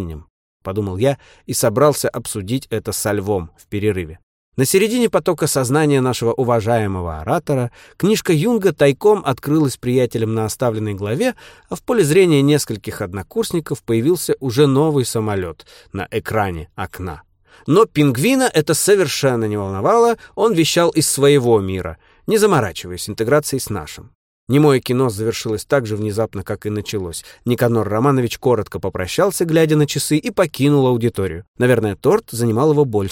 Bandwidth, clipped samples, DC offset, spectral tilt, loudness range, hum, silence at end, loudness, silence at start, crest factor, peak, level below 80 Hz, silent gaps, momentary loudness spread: 17 kHz; under 0.1%; under 0.1%; -5.5 dB/octave; 4 LU; none; 0 s; -17 LUFS; 0 s; 16 dB; 0 dBFS; -46 dBFS; 0.30-0.60 s, 4.23-4.52 s, 24.15-24.47 s, 31.48-31.54 s; 12 LU